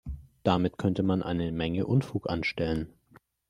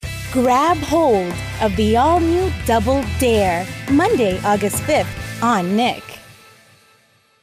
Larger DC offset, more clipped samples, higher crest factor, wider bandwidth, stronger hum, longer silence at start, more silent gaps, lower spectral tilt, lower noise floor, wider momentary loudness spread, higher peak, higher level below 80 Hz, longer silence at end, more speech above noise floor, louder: neither; neither; first, 20 dB vs 12 dB; second, 11 kHz vs 16 kHz; neither; about the same, 0.05 s vs 0 s; neither; first, -8 dB/octave vs -5.5 dB/octave; first, -61 dBFS vs -56 dBFS; about the same, 6 LU vs 6 LU; second, -10 dBFS vs -6 dBFS; second, -50 dBFS vs -34 dBFS; second, 0.6 s vs 1.1 s; second, 33 dB vs 40 dB; second, -29 LUFS vs -17 LUFS